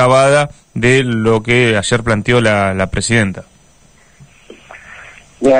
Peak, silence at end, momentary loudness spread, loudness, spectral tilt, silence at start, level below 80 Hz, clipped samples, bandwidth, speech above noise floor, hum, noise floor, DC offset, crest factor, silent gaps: 0 dBFS; 0 s; 21 LU; -13 LUFS; -5 dB/octave; 0 s; -38 dBFS; under 0.1%; 10 kHz; 35 dB; none; -48 dBFS; 0.2%; 14 dB; none